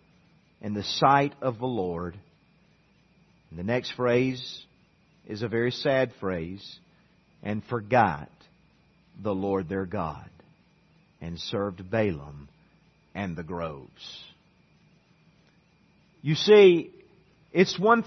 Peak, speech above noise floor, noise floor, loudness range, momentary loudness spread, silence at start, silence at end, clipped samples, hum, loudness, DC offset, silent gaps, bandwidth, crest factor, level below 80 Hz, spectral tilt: -6 dBFS; 37 dB; -62 dBFS; 10 LU; 21 LU; 0.65 s; 0 s; under 0.1%; none; -26 LUFS; under 0.1%; none; 6.4 kHz; 22 dB; -62 dBFS; -6 dB/octave